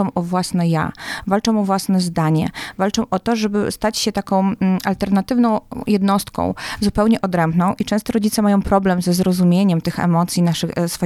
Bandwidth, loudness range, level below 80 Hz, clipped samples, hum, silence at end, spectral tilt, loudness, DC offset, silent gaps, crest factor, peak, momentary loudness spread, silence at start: 15 kHz; 2 LU; -42 dBFS; under 0.1%; none; 0 s; -6 dB/octave; -18 LUFS; under 0.1%; none; 16 dB; -2 dBFS; 5 LU; 0 s